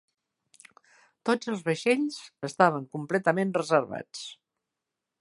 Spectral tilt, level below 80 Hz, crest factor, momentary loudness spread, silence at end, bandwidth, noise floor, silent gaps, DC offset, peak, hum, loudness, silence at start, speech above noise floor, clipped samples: -5.5 dB/octave; -76 dBFS; 24 dB; 14 LU; 0.9 s; 11.5 kHz; -87 dBFS; none; under 0.1%; -4 dBFS; none; -27 LUFS; 1.25 s; 59 dB; under 0.1%